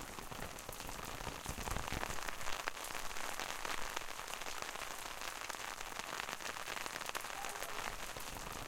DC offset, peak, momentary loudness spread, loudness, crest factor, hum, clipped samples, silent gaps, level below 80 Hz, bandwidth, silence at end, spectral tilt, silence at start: under 0.1%; -16 dBFS; 4 LU; -43 LUFS; 28 dB; none; under 0.1%; none; -54 dBFS; 17 kHz; 0 s; -2 dB/octave; 0 s